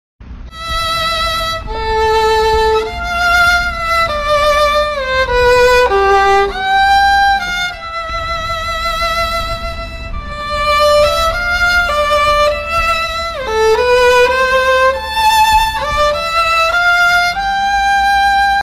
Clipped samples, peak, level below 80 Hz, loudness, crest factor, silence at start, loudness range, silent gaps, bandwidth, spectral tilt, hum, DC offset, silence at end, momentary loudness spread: under 0.1%; -2 dBFS; -28 dBFS; -12 LUFS; 10 dB; 0.2 s; 4 LU; none; 16 kHz; -2.5 dB/octave; none; under 0.1%; 0 s; 9 LU